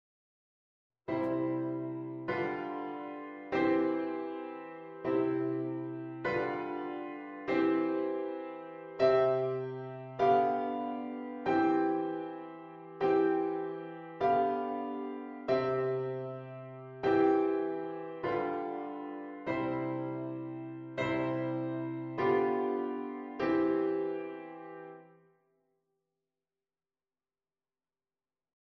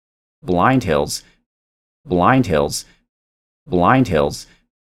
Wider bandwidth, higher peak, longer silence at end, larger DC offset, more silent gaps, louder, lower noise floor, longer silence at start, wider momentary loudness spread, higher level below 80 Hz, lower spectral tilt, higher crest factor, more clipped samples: second, 6.2 kHz vs 15.5 kHz; second, -14 dBFS vs 0 dBFS; first, 3.65 s vs 0.4 s; neither; second, none vs 1.46-2.04 s, 3.09-3.66 s; second, -33 LUFS vs -17 LUFS; about the same, under -90 dBFS vs under -90 dBFS; first, 1.1 s vs 0.45 s; about the same, 15 LU vs 13 LU; second, -72 dBFS vs -42 dBFS; first, -8.5 dB/octave vs -5.5 dB/octave; about the same, 20 dB vs 18 dB; neither